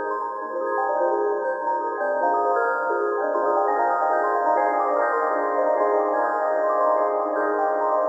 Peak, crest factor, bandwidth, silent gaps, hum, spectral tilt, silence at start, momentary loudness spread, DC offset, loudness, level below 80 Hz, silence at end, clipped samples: -10 dBFS; 12 dB; 8 kHz; none; none; -5.5 dB/octave; 0 s; 4 LU; under 0.1%; -22 LUFS; under -90 dBFS; 0 s; under 0.1%